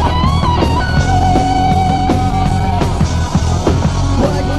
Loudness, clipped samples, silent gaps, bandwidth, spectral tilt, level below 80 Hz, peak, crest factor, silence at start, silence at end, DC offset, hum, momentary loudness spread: -14 LUFS; under 0.1%; none; 12.5 kHz; -6.5 dB/octave; -20 dBFS; 0 dBFS; 12 dB; 0 s; 0 s; 3%; none; 3 LU